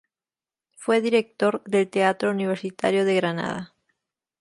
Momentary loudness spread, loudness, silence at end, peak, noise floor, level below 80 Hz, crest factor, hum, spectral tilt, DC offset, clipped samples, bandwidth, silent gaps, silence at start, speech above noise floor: 10 LU; -23 LUFS; 0.75 s; -6 dBFS; under -90 dBFS; -70 dBFS; 18 dB; none; -5.5 dB/octave; under 0.1%; under 0.1%; 11.5 kHz; none; 0.8 s; over 67 dB